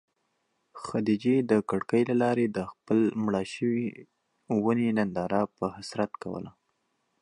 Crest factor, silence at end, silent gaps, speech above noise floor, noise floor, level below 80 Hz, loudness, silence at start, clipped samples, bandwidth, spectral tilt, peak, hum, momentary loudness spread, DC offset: 18 dB; 0.7 s; none; 49 dB; -76 dBFS; -64 dBFS; -28 LUFS; 0.75 s; under 0.1%; 11 kHz; -7 dB/octave; -10 dBFS; none; 11 LU; under 0.1%